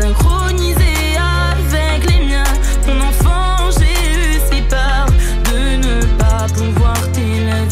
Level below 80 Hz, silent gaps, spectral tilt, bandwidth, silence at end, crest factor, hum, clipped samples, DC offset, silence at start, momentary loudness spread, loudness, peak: -14 dBFS; none; -5 dB/octave; 15.5 kHz; 0 s; 8 dB; none; under 0.1%; under 0.1%; 0 s; 2 LU; -14 LUFS; -2 dBFS